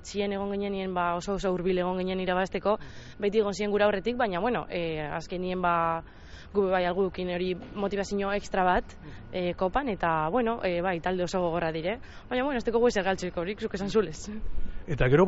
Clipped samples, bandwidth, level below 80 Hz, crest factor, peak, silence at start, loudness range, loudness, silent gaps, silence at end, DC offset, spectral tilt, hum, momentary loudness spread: under 0.1%; 8 kHz; -44 dBFS; 18 dB; -8 dBFS; 0 s; 1 LU; -29 LUFS; none; 0 s; under 0.1%; -4.5 dB/octave; none; 9 LU